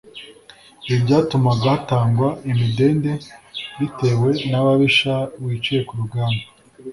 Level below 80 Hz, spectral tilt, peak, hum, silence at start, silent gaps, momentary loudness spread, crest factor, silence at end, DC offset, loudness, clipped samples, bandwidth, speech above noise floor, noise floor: -50 dBFS; -7 dB/octave; -2 dBFS; none; 0.15 s; none; 15 LU; 16 dB; 0 s; under 0.1%; -19 LUFS; under 0.1%; 11.5 kHz; 29 dB; -47 dBFS